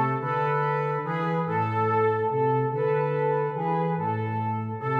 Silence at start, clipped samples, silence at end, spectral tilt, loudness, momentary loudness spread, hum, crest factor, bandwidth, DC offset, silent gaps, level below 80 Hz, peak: 0 s; under 0.1%; 0 s; -9.5 dB/octave; -26 LUFS; 4 LU; none; 12 dB; 5.2 kHz; under 0.1%; none; -70 dBFS; -12 dBFS